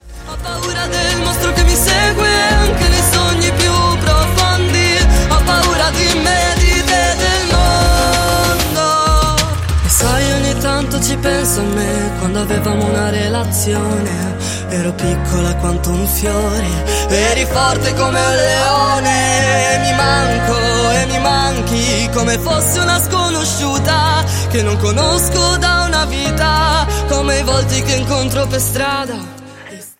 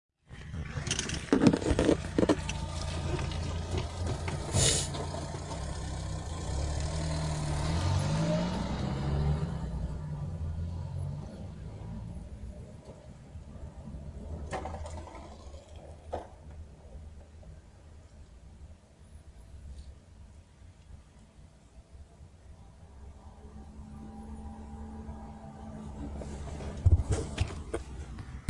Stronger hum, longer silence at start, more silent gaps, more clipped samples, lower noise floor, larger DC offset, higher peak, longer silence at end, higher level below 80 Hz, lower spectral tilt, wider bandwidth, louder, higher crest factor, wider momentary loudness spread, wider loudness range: neither; second, 0.05 s vs 0.3 s; neither; neither; second, -33 dBFS vs -55 dBFS; neither; first, 0 dBFS vs -6 dBFS; about the same, 0.05 s vs 0 s; first, -20 dBFS vs -42 dBFS; second, -3.5 dB/octave vs -5 dB/octave; first, 16.5 kHz vs 11.5 kHz; first, -13 LUFS vs -33 LUFS; second, 14 dB vs 28 dB; second, 6 LU vs 26 LU; second, 4 LU vs 23 LU